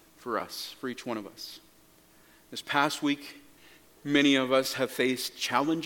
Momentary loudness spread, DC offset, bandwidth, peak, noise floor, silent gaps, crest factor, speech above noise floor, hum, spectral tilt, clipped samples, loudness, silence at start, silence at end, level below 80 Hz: 19 LU; under 0.1%; 17.5 kHz; -8 dBFS; -59 dBFS; none; 22 dB; 30 dB; none; -3.5 dB/octave; under 0.1%; -28 LUFS; 0.25 s; 0 s; -74 dBFS